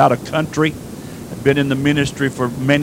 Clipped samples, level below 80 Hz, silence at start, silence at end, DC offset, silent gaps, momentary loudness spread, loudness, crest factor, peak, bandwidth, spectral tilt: under 0.1%; -44 dBFS; 0 s; 0 s; under 0.1%; none; 15 LU; -18 LUFS; 18 dB; 0 dBFS; 16 kHz; -6 dB/octave